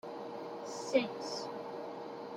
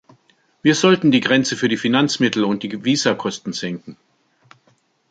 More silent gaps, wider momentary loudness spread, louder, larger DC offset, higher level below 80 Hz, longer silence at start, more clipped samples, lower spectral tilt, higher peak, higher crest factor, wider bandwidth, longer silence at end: neither; about the same, 11 LU vs 12 LU; second, -39 LUFS vs -18 LUFS; neither; second, -84 dBFS vs -62 dBFS; second, 0.05 s vs 0.65 s; neither; about the same, -3.5 dB/octave vs -4.5 dB/octave; second, -16 dBFS vs 0 dBFS; first, 24 dB vs 18 dB; first, 14.5 kHz vs 9.2 kHz; second, 0 s vs 1.15 s